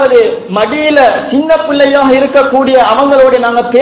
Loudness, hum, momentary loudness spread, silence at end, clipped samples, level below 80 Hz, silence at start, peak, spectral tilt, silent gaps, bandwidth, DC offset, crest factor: -8 LUFS; none; 5 LU; 0 s; 5%; -44 dBFS; 0 s; 0 dBFS; -8.5 dB/octave; none; 4 kHz; 0.3%; 8 dB